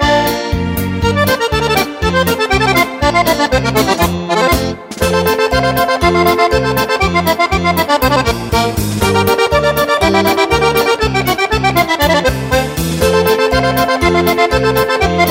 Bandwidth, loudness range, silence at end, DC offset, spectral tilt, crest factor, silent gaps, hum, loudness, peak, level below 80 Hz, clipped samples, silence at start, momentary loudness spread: 16.5 kHz; 1 LU; 0 s; under 0.1%; -4.5 dB/octave; 12 dB; none; none; -12 LUFS; 0 dBFS; -26 dBFS; under 0.1%; 0 s; 4 LU